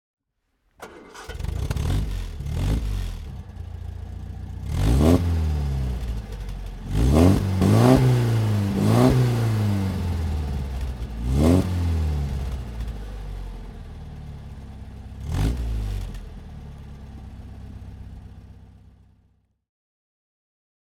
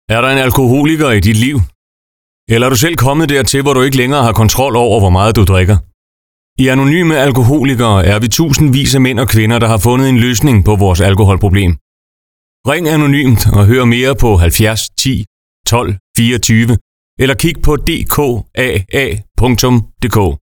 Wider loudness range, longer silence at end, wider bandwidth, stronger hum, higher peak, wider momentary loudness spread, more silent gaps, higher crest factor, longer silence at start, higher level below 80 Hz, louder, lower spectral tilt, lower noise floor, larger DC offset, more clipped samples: first, 16 LU vs 3 LU; first, 2.2 s vs 0.05 s; second, 16.5 kHz vs 19.5 kHz; neither; about the same, -2 dBFS vs 0 dBFS; first, 23 LU vs 6 LU; second, none vs 1.75-2.47 s, 5.94-6.56 s, 11.81-12.64 s, 15.27-15.64 s, 16.00-16.14 s, 16.81-17.17 s; first, 22 dB vs 10 dB; first, 0.8 s vs 0.1 s; second, -30 dBFS vs -24 dBFS; second, -23 LUFS vs -10 LUFS; first, -7.5 dB/octave vs -5.5 dB/octave; second, -72 dBFS vs under -90 dBFS; second, under 0.1% vs 0.1%; neither